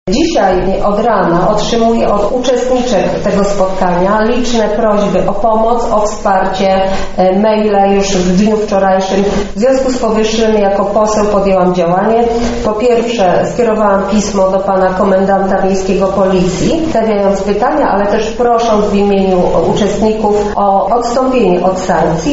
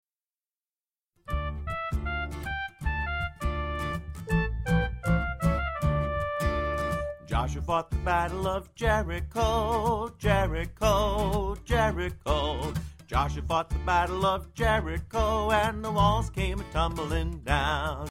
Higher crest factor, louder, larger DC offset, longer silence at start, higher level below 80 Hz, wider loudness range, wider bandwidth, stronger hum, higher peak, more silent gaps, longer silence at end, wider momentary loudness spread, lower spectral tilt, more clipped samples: second, 10 dB vs 18 dB; first, -11 LUFS vs -29 LUFS; neither; second, 0.05 s vs 1.25 s; first, -28 dBFS vs -34 dBFS; second, 1 LU vs 5 LU; second, 8 kHz vs 16 kHz; neither; first, 0 dBFS vs -10 dBFS; neither; about the same, 0 s vs 0 s; second, 2 LU vs 7 LU; about the same, -5 dB/octave vs -6 dB/octave; neither